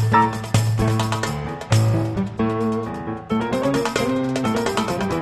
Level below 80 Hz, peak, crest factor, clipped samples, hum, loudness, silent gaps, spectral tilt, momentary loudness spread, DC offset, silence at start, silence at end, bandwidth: -42 dBFS; -2 dBFS; 18 dB; under 0.1%; none; -21 LUFS; none; -6 dB/octave; 7 LU; under 0.1%; 0 s; 0 s; 13.5 kHz